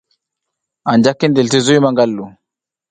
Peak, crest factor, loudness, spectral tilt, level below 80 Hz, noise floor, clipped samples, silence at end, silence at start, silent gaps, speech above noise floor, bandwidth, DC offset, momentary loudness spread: 0 dBFS; 16 dB; -13 LUFS; -5 dB/octave; -56 dBFS; -82 dBFS; under 0.1%; 0.6 s; 0.85 s; none; 69 dB; 9.4 kHz; under 0.1%; 13 LU